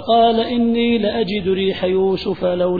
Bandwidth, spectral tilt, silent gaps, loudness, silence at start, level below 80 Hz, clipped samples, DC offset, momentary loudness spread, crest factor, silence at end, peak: 4.9 kHz; -8.5 dB/octave; none; -17 LUFS; 0 s; -46 dBFS; under 0.1%; 0.6%; 5 LU; 14 dB; 0 s; -4 dBFS